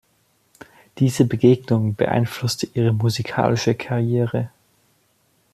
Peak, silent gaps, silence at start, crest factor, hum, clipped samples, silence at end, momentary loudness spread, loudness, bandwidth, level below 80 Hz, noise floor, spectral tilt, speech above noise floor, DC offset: -4 dBFS; none; 0.95 s; 18 dB; none; under 0.1%; 1.05 s; 7 LU; -20 LUFS; 14 kHz; -56 dBFS; -63 dBFS; -6.5 dB/octave; 44 dB; under 0.1%